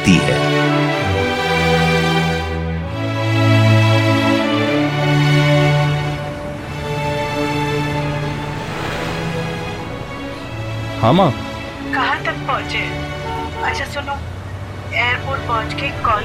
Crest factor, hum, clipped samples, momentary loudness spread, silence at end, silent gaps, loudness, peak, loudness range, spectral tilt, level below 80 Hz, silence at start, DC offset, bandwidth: 16 dB; none; under 0.1%; 12 LU; 0 s; none; -18 LUFS; 0 dBFS; 7 LU; -6 dB/octave; -38 dBFS; 0 s; under 0.1%; 15.5 kHz